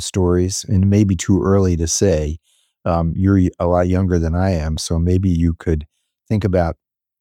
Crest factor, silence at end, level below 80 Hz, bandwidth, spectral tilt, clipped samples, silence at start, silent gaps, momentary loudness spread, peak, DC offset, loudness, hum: 14 dB; 0.45 s; -30 dBFS; 12.5 kHz; -6.5 dB/octave; under 0.1%; 0 s; none; 7 LU; -2 dBFS; under 0.1%; -17 LUFS; none